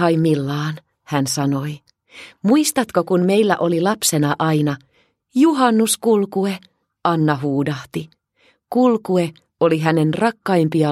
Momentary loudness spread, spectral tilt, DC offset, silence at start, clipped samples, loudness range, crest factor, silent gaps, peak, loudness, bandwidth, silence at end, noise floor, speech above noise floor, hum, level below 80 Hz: 10 LU; -5.5 dB/octave; under 0.1%; 0 s; under 0.1%; 3 LU; 18 dB; none; 0 dBFS; -18 LUFS; 15.5 kHz; 0 s; -60 dBFS; 42 dB; none; -62 dBFS